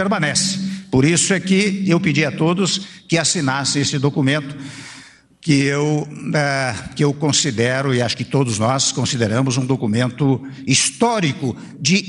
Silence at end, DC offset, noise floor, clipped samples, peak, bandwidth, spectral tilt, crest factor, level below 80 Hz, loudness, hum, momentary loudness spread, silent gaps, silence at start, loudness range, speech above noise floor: 0 s; under 0.1%; -43 dBFS; under 0.1%; -2 dBFS; 11.5 kHz; -4 dB/octave; 16 dB; -52 dBFS; -18 LUFS; none; 7 LU; none; 0 s; 3 LU; 26 dB